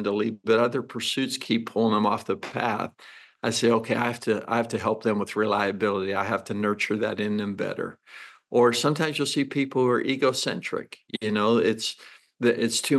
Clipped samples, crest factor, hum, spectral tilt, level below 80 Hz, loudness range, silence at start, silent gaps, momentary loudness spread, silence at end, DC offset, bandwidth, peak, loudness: under 0.1%; 16 dB; none; -4.5 dB/octave; -78 dBFS; 2 LU; 0 s; none; 9 LU; 0 s; under 0.1%; 12.5 kHz; -8 dBFS; -25 LUFS